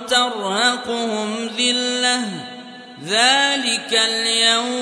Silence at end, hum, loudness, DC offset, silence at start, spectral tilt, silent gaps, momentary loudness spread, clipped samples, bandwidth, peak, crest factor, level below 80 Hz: 0 s; none; -17 LUFS; under 0.1%; 0 s; -1 dB/octave; none; 16 LU; under 0.1%; 11 kHz; -2 dBFS; 18 dB; -70 dBFS